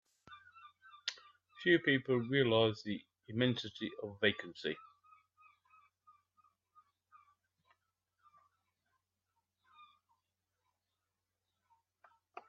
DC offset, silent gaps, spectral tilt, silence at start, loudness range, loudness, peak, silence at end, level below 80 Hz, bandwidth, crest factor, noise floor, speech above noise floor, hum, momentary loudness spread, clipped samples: under 0.1%; none; -3.5 dB/octave; 0.3 s; 11 LU; -35 LUFS; -16 dBFS; 0.1 s; -80 dBFS; 7.4 kHz; 26 dB; -89 dBFS; 55 dB; none; 17 LU; under 0.1%